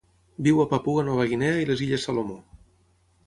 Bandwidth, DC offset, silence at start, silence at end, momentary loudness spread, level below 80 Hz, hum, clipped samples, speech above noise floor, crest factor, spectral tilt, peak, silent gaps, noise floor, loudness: 11.5 kHz; under 0.1%; 0.4 s; 0.7 s; 12 LU; -54 dBFS; none; under 0.1%; 40 dB; 18 dB; -6.5 dB/octave; -8 dBFS; none; -63 dBFS; -24 LUFS